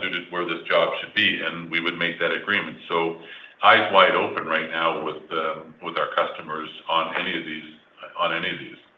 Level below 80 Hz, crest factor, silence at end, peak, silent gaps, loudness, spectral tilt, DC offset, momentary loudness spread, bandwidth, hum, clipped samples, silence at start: -70 dBFS; 22 dB; 0.25 s; -2 dBFS; none; -23 LUFS; -6 dB/octave; under 0.1%; 15 LU; 6.8 kHz; none; under 0.1%; 0 s